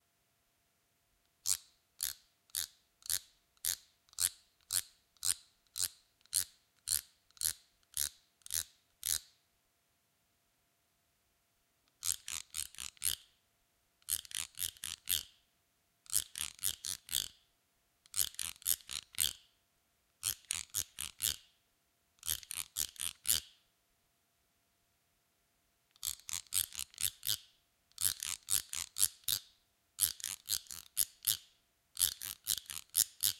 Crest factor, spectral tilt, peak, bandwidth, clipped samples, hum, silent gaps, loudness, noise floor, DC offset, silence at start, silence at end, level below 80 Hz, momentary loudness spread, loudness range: 32 dB; 2 dB/octave; -8 dBFS; 17 kHz; under 0.1%; none; none; -37 LUFS; -78 dBFS; under 0.1%; 1.45 s; 0 s; -68 dBFS; 9 LU; 6 LU